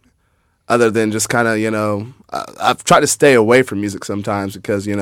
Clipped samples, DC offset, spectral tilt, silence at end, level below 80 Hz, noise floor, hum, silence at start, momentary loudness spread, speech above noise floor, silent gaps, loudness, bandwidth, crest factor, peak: under 0.1%; under 0.1%; -4 dB/octave; 0 s; -52 dBFS; -61 dBFS; none; 0.7 s; 12 LU; 46 dB; none; -15 LUFS; 17 kHz; 16 dB; 0 dBFS